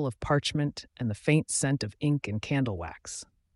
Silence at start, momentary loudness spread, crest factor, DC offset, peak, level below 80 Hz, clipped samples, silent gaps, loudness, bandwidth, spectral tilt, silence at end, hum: 0 s; 12 LU; 20 dB; under 0.1%; -10 dBFS; -54 dBFS; under 0.1%; none; -29 LUFS; 11.5 kHz; -5 dB/octave; 0.3 s; none